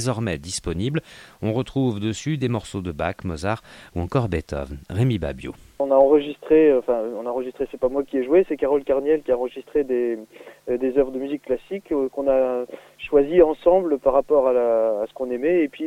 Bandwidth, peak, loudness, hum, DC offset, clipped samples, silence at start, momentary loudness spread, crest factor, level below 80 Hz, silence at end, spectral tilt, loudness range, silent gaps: 14 kHz; -4 dBFS; -22 LUFS; none; under 0.1%; under 0.1%; 0 s; 12 LU; 18 dB; -44 dBFS; 0 s; -7 dB/octave; 6 LU; none